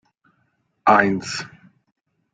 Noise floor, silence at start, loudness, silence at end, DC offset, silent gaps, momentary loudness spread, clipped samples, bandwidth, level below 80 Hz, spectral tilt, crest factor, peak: -68 dBFS; 0.85 s; -19 LUFS; 0.85 s; under 0.1%; none; 15 LU; under 0.1%; 9.4 kHz; -60 dBFS; -4.5 dB/octave; 22 dB; -2 dBFS